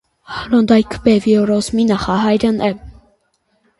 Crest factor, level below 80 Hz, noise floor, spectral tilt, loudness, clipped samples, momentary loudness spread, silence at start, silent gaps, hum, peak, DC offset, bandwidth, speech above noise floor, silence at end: 16 dB; -42 dBFS; -63 dBFS; -6 dB/octave; -15 LUFS; under 0.1%; 10 LU; 0.3 s; none; none; 0 dBFS; under 0.1%; 11.5 kHz; 49 dB; 0.9 s